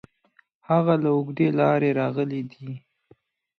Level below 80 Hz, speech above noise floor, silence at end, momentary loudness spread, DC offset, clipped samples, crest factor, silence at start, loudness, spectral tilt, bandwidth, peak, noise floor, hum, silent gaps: -70 dBFS; 40 dB; 0.8 s; 17 LU; under 0.1%; under 0.1%; 16 dB; 0.7 s; -23 LUFS; -10 dB/octave; 6.4 kHz; -8 dBFS; -63 dBFS; none; none